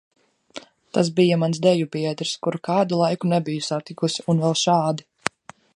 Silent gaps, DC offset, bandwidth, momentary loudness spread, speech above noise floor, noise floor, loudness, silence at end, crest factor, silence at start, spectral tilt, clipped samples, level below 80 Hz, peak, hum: none; under 0.1%; 11 kHz; 11 LU; 22 dB; -43 dBFS; -22 LUFS; 0.45 s; 22 dB; 0.55 s; -5.5 dB/octave; under 0.1%; -64 dBFS; 0 dBFS; none